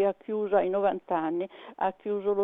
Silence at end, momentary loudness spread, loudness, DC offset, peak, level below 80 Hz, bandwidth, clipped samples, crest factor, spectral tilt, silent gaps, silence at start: 0 s; 6 LU; -29 LUFS; under 0.1%; -12 dBFS; -70 dBFS; 3.9 kHz; under 0.1%; 16 dB; -9 dB/octave; none; 0 s